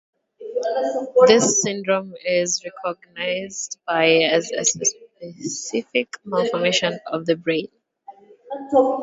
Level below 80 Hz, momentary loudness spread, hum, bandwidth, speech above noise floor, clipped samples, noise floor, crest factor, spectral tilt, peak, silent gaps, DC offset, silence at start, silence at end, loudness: -66 dBFS; 14 LU; none; 8 kHz; 25 dB; under 0.1%; -46 dBFS; 22 dB; -2.5 dB/octave; 0 dBFS; none; under 0.1%; 0.4 s; 0 s; -20 LUFS